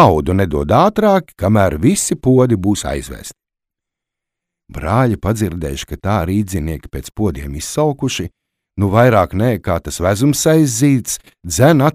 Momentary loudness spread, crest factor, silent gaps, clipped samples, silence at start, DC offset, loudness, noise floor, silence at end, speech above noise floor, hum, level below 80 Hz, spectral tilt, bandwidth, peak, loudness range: 13 LU; 16 dB; none; under 0.1%; 0 s; under 0.1%; -15 LUFS; -82 dBFS; 0.05 s; 68 dB; none; -34 dBFS; -6 dB/octave; 16 kHz; 0 dBFS; 6 LU